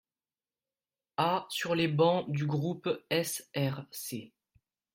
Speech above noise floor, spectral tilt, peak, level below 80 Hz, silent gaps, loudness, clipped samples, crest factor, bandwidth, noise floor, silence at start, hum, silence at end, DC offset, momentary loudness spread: over 59 dB; -5 dB/octave; -14 dBFS; -74 dBFS; none; -32 LUFS; under 0.1%; 20 dB; 16.5 kHz; under -90 dBFS; 1.2 s; none; 0.7 s; under 0.1%; 12 LU